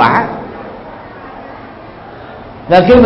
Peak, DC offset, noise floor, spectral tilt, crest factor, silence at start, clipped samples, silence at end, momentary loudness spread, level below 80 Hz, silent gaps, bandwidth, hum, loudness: 0 dBFS; under 0.1%; -31 dBFS; -8 dB/octave; 14 dB; 0 s; 0.3%; 0 s; 21 LU; -36 dBFS; none; 5.8 kHz; none; -11 LUFS